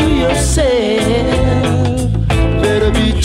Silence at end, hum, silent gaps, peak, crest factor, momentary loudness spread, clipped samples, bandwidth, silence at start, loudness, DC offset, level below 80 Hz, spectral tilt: 0 s; none; none; -2 dBFS; 12 dB; 2 LU; under 0.1%; 15.5 kHz; 0 s; -13 LUFS; under 0.1%; -20 dBFS; -5.5 dB/octave